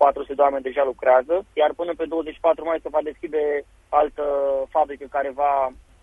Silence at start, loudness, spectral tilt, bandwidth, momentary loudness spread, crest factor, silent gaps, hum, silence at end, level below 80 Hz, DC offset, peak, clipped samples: 0 s; -22 LUFS; -6 dB/octave; 3.8 kHz; 8 LU; 18 dB; none; none; 0.3 s; -52 dBFS; under 0.1%; -2 dBFS; under 0.1%